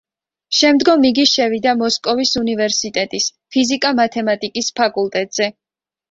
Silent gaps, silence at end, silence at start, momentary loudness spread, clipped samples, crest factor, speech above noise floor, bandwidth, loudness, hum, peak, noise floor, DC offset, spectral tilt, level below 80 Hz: none; 0.6 s; 0.5 s; 8 LU; under 0.1%; 16 dB; 73 dB; 7.8 kHz; -16 LUFS; none; 0 dBFS; -89 dBFS; under 0.1%; -2.5 dB/octave; -56 dBFS